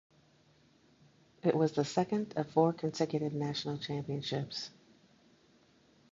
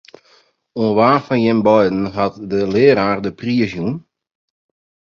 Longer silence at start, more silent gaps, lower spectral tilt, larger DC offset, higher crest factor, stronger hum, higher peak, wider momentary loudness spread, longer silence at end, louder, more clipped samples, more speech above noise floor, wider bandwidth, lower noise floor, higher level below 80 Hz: first, 1.45 s vs 0.75 s; neither; second, -6 dB/octave vs -8 dB/octave; neither; first, 22 dB vs 16 dB; neither; second, -14 dBFS vs 0 dBFS; about the same, 8 LU vs 10 LU; first, 1.4 s vs 1.05 s; second, -34 LUFS vs -16 LUFS; neither; second, 33 dB vs 39 dB; first, 7.8 kHz vs 7 kHz; first, -66 dBFS vs -55 dBFS; second, -72 dBFS vs -50 dBFS